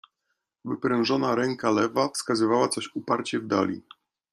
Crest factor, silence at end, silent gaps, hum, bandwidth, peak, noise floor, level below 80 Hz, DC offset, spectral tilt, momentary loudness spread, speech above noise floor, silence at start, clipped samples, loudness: 18 dB; 0.55 s; none; none; 13.5 kHz; -8 dBFS; -79 dBFS; -70 dBFS; under 0.1%; -4.5 dB/octave; 7 LU; 54 dB; 0.65 s; under 0.1%; -26 LUFS